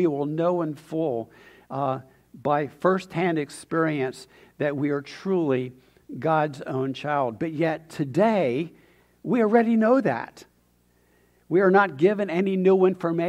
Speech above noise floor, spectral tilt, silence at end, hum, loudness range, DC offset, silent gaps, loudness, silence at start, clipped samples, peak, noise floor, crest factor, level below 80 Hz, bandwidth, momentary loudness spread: 40 dB; -7.5 dB/octave; 0 s; none; 4 LU; under 0.1%; none; -24 LUFS; 0 s; under 0.1%; -6 dBFS; -63 dBFS; 18 dB; -68 dBFS; 12 kHz; 12 LU